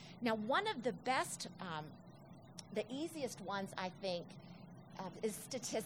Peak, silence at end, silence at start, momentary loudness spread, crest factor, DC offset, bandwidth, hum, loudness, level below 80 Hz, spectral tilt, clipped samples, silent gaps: -22 dBFS; 0 s; 0 s; 18 LU; 20 dB; under 0.1%; over 20 kHz; none; -41 LUFS; -80 dBFS; -3.5 dB/octave; under 0.1%; none